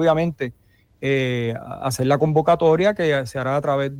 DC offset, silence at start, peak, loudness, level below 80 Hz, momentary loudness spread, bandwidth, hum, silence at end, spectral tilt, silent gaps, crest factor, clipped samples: under 0.1%; 0 s; -6 dBFS; -20 LUFS; -52 dBFS; 11 LU; 16 kHz; none; 0 s; -6.5 dB/octave; none; 14 dB; under 0.1%